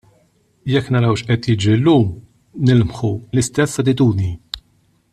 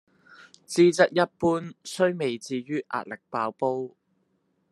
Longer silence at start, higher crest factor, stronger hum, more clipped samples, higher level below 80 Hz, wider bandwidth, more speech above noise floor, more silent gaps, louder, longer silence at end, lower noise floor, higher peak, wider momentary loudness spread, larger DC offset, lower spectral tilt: about the same, 0.65 s vs 0.7 s; second, 14 dB vs 22 dB; neither; neither; first, -46 dBFS vs -70 dBFS; about the same, 12.5 kHz vs 12.5 kHz; about the same, 43 dB vs 46 dB; neither; first, -17 LUFS vs -26 LUFS; second, 0.55 s vs 0.85 s; second, -59 dBFS vs -71 dBFS; about the same, -2 dBFS vs -4 dBFS; about the same, 15 LU vs 13 LU; neither; first, -6.5 dB/octave vs -5 dB/octave